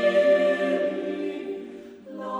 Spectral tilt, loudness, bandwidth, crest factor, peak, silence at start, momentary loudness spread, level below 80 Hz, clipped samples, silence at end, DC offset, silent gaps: -5.5 dB/octave; -24 LUFS; 9.2 kHz; 14 dB; -10 dBFS; 0 s; 21 LU; -72 dBFS; under 0.1%; 0 s; under 0.1%; none